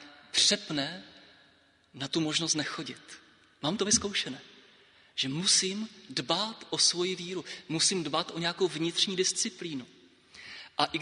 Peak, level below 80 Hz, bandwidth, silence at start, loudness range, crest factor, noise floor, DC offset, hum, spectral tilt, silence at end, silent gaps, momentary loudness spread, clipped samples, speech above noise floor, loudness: -8 dBFS; -68 dBFS; 10.5 kHz; 0 s; 3 LU; 24 dB; -64 dBFS; under 0.1%; none; -2 dB/octave; 0 s; none; 16 LU; under 0.1%; 33 dB; -29 LUFS